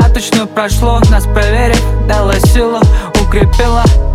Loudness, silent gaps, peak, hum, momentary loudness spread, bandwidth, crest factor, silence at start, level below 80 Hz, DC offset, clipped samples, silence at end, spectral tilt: -10 LUFS; none; 0 dBFS; none; 3 LU; 15 kHz; 8 dB; 0 s; -10 dBFS; under 0.1%; under 0.1%; 0 s; -5.5 dB/octave